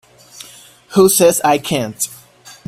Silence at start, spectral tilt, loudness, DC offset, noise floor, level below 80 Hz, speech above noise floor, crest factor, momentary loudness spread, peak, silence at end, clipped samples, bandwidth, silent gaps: 0.35 s; -3.5 dB/octave; -14 LUFS; under 0.1%; -42 dBFS; -54 dBFS; 29 dB; 16 dB; 25 LU; 0 dBFS; 0.15 s; under 0.1%; 16 kHz; none